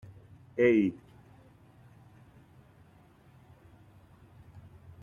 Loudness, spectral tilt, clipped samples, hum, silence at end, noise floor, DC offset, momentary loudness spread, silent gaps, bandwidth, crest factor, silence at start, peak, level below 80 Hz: -27 LUFS; -8.5 dB/octave; under 0.1%; none; 0.45 s; -59 dBFS; under 0.1%; 29 LU; none; 7 kHz; 22 dB; 0.55 s; -12 dBFS; -68 dBFS